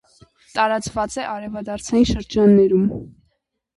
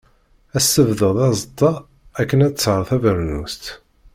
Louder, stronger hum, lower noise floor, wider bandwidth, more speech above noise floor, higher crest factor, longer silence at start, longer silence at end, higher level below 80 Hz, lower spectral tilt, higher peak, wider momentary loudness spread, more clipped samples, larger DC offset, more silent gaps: about the same, -19 LUFS vs -18 LUFS; neither; first, -70 dBFS vs -55 dBFS; second, 11.5 kHz vs 16.5 kHz; first, 51 dB vs 38 dB; about the same, 16 dB vs 16 dB; about the same, 0.55 s vs 0.55 s; first, 0.7 s vs 0.4 s; about the same, -40 dBFS vs -42 dBFS; about the same, -6 dB/octave vs -5 dB/octave; about the same, -4 dBFS vs -2 dBFS; about the same, 15 LU vs 15 LU; neither; neither; neither